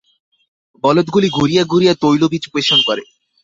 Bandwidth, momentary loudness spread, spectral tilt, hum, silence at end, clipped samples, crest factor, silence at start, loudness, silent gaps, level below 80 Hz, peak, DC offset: 7.8 kHz; 6 LU; -5 dB/octave; none; 0.4 s; under 0.1%; 14 dB; 0.85 s; -14 LUFS; none; -52 dBFS; -2 dBFS; under 0.1%